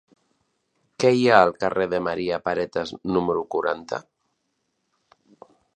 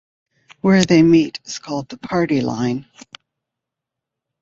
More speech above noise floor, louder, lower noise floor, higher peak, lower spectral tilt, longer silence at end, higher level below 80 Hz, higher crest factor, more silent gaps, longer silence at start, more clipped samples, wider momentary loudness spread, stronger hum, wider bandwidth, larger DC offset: second, 53 dB vs 67 dB; second, -22 LUFS vs -17 LUFS; second, -75 dBFS vs -83 dBFS; about the same, 0 dBFS vs -2 dBFS; about the same, -5.5 dB/octave vs -6 dB/octave; first, 1.75 s vs 1.6 s; about the same, -58 dBFS vs -54 dBFS; first, 24 dB vs 18 dB; neither; first, 1 s vs 0.65 s; neither; second, 12 LU vs 15 LU; neither; first, 9.2 kHz vs 7.8 kHz; neither